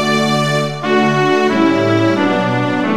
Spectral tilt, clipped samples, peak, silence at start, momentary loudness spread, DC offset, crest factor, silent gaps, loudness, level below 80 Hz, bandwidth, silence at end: -5.5 dB/octave; under 0.1%; 0 dBFS; 0 s; 3 LU; 1%; 14 dB; none; -14 LUFS; -56 dBFS; 14.5 kHz; 0 s